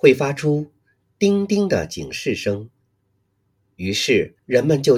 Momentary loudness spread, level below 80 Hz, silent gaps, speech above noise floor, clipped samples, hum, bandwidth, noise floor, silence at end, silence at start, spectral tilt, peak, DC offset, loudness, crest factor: 10 LU; -54 dBFS; none; 49 dB; under 0.1%; none; 15 kHz; -67 dBFS; 0 s; 0.05 s; -5.5 dB/octave; 0 dBFS; under 0.1%; -20 LUFS; 20 dB